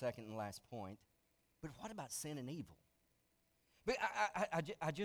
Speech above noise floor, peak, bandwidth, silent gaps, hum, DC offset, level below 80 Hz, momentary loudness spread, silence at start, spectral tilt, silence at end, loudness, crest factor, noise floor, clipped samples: 36 dB; -24 dBFS; over 20 kHz; none; none; under 0.1%; -72 dBFS; 16 LU; 0 s; -4.5 dB/octave; 0 s; -44 LUFS; 22 dB; -80 dBFS; under 0.1%